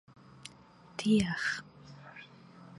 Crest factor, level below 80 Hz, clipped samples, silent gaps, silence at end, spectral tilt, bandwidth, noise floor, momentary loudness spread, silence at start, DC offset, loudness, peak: 20 dB; -62 dBFS; under 0.1%; none; 0 s; -5 dB/octave; 11.5 kHz; -57 dBFS; 25 LU; 0.45 s; under 0.1%; -31 LUFS; -16 dBFS